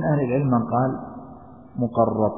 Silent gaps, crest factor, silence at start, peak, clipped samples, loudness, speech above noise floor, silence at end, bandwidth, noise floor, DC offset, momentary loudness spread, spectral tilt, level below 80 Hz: none; 18 dB; 0 s; -6 dBFS; under 0.1%; -23 LUFS; 22 dB; 0 s; 3.6 kHz; -43 dBFS; 0.2%; 18 LU; -14 dB/octave; -54 dBFS